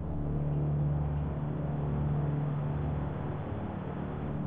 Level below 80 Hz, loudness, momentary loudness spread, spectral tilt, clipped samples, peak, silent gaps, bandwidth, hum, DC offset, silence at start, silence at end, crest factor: -42 dBFS; -33 LUFS; 6 LU; -10 dB/octave; under 0.1%; -22 dBFS; none; 3.7 kHz; none; under 0.1%; 0 s; 0 s; 10 dB